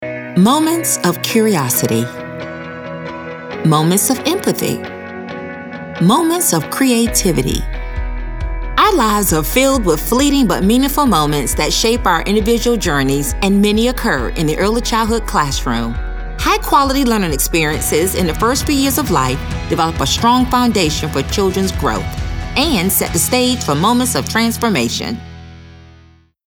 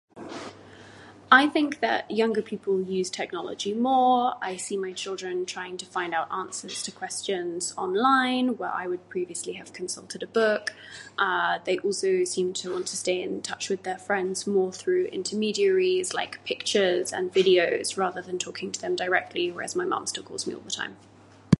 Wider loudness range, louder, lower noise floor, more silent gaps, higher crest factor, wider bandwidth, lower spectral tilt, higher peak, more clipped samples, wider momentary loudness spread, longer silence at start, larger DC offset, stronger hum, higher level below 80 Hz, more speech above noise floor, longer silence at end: about the same, 3 LU vs 4 LU; first, -14 LUFS vs -26 LUFS; about the same, -46 dBFS vs -48 dBFS; neither; second, 14 dB vs 26 dB; first, over 20 kHz vs 11.5 kHz; about the same, -4 dB/octave vs -3.5 dB/octave; about the same, 0 dBFS vs -2 dBFS; neither; about the same, 13 LU vs 12 LU; second, 0 s vs 0.15 s; neither; neither; first, -26 dBFS vs -62 dBFS; first, 32 dB vs 22 dB; first, 0.7 s vs 0.05 s